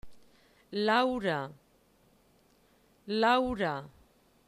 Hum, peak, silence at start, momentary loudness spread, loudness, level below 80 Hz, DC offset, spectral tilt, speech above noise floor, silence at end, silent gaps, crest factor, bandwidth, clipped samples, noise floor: none; -14 dBFS; 0.05 s; 13 LU; -30 LUFS; -60 dBFS; under 0.1%; -5.5 dB/octave; 37 dB; 0.6 s; none; 20 dB; 13.5 kHz; under 0.1%; -66 dBFS